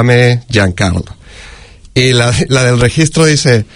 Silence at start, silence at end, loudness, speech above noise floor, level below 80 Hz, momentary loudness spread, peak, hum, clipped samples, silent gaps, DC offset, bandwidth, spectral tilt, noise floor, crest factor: 0 s; 0.1 s; -10 LUFS; 25 dB; -32 dBFS; 7 LU; 0 dBFS; none; 0.4%; none; under 0.1%; 11 kHz; -5 dB/octave; -34 dBFS; 10 dB